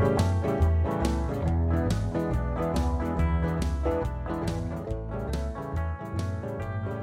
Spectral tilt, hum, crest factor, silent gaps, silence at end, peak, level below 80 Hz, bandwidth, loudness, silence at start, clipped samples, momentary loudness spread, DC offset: -7.5 dB/octave; none; 16 dB; none; 0 s; -10 dBFS; -32 dBFS; 13 kHz; -29 LUFS; 0 s; under 0.1%; 8 LU; under 0.1%